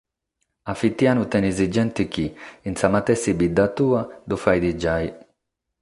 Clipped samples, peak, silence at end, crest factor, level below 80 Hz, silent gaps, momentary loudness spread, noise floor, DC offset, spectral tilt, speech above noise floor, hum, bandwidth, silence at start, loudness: under 0.1%; -2 dBFS; 0.65 s; 20 dB; -44 dBFS; none; 11 LU; -78 dBFS; under 0.1%; -6 dB/octave; 57 dB; none; 11.5 kHz; 0.65 s; -22 LUFS